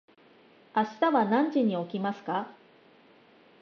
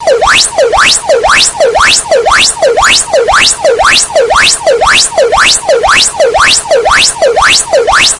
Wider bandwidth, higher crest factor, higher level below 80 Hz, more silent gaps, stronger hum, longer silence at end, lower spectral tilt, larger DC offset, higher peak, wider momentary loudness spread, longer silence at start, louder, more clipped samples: second, 6.6 kHz vs 12 kHz; first, 18 dB vs 6 dB; second, -84 dBFS vs -30 dBFS; neither; neither; first, 1.1 s vs 0 s; first, -7.5 dB/octave vs 0 dB/octave; neither; second, -12 dBFS vs 0 dBFS; first, 9 LU vs 2 LU; first, 0.75 s vs 0 s; second, -28 LUFS vs -5 LUFS; second, under 0.1% vs 2%